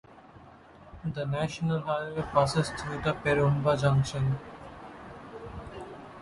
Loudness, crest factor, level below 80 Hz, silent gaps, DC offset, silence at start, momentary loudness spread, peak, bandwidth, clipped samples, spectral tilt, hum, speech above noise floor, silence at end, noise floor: -29 LUFS; 20 dB; -52 dBFS; none; under 0.1%; 0.1 s; 20 LU; -10 dBFS; 11.5 kHz; under 0.1%; -6.5 dB/octave; none; 24 dB; 0 s; -52 dBFS